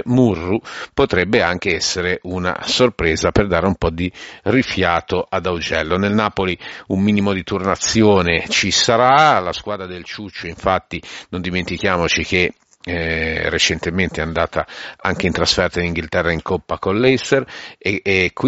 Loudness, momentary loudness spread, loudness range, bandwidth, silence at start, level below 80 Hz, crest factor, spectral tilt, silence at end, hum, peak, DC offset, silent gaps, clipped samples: -17 LUFS; 11 LU; 4 LU; 8 kHz; 0.05 s; -38 dBFS; 18 dB; -3.5 dB/octave; 0 s; none; 0 dBFS; under 0.1%; none; under 0.1%